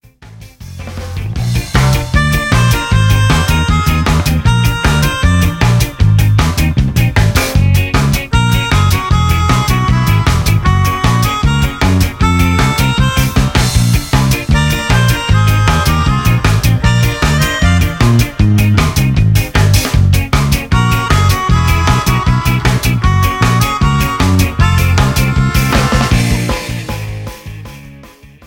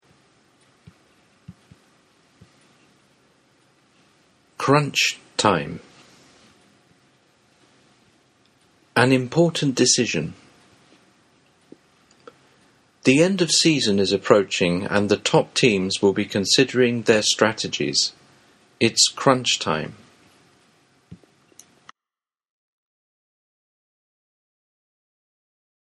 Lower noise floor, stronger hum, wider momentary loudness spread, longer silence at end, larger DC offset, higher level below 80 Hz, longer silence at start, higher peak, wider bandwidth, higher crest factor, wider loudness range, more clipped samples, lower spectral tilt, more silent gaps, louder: second, -37 dBFS vs under -90 dBFS; neither; second, 2 LU vs 8 LU; second, 0.4 s vs 4.8 s; neither; first, -18 dBFS vs -62 dBFS; second, 0.2 s vs 1.5 s; about the same, 0 dBFS vs 0 dBFS; first, 17.5 kHz vs 13 kHz; second, 10 dB vs 24 dB; second, 1 LU vs 9 LU; first, 0.1% vs under 0.1%; first, -5 dB/octave vs -3.5 dB/octave; neither; first, -12 LUFS vs -19 LUFS